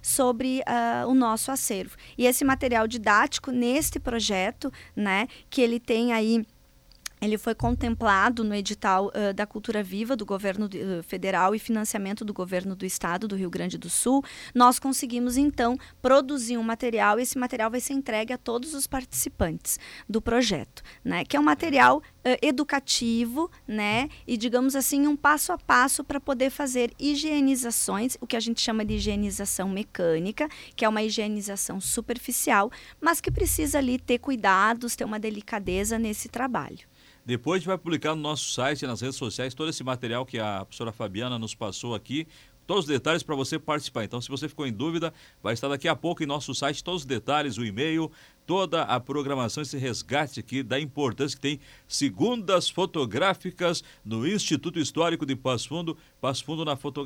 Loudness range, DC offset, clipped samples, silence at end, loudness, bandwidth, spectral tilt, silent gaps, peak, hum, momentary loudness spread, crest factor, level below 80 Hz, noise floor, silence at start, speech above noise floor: 6 LU; under 0.1%; under 0.1%; 0 s; -26 LUFS; 17.5 kHz; -3.5 dB/octave; none; -8 dBFS; none; 10 LU; 20 dB; -48 dBFS; -56 dBFS; 0 s; 30 dB